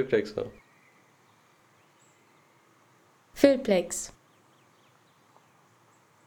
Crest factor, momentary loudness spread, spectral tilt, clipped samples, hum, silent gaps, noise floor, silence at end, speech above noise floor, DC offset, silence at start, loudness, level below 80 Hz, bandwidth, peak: 26 dB; 19 LU; -4.5 dB/octave; under 0.1%; none; none; -62 dBFS; 2.15 s; 37 dB; under 0.1%; 0 s; -27 LUFS; -64 dBFS; 20 kHz; -6 dBFS